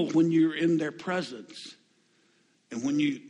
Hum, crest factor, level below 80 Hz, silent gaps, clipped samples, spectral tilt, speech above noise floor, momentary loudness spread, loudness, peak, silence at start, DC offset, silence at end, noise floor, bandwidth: none; 14 dB; -74 dBFS; none; under 0.1%; -6 dB/octave; 40 dB; 19 LU; -27 LUFS; -14 dBFS; 0 s; under 0.1%; 0 s; -67 dBFS; 10 kHz